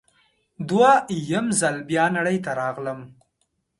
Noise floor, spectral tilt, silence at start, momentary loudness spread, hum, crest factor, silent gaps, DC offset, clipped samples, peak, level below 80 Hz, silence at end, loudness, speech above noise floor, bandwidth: -73 dBFS; -4.5 dB/octave; 0.6 s; 15 LU; none; 18 dB; none; under 0.1%; under 0.1%; -4 dBFS; -64 dBFS; 0.7 s; -21 LUFS; 51 dB; 11.5 kHz